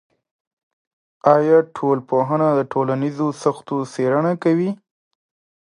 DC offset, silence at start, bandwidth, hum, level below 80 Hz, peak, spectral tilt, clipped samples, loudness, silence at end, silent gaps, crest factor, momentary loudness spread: under 0.1%; 1.25 s; 11 kHz; none; -70 dBFS; 0 dBFS; -8 dB/octave; under 0.1%; -19 LUFS; 0.9 s; none; 20 dB; 8 LU